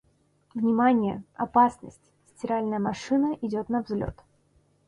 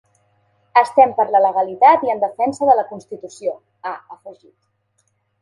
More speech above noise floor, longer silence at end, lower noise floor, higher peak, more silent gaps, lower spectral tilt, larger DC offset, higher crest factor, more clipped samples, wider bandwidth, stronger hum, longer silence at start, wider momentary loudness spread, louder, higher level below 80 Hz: second, 40 dB vs 50 dB; second, 0.75 s vs 1.1 s; about the same, -65 dBFS vs -67 dBFS; second, -8 dBFS vs 0 dBFS; neither; first, -7 dB/octave vs -5 dB/octave; neither; about the same, 18 dB vs 18 dB; neither; about the same, 10.5 kHz vs 11 kHz; neither; second, 0.55 s vs 0.75 s; second, 13 LU vs 17 LU; second, -26 LUFS vs -16 LUFS; first, -56 dBFS vs -68 dBFS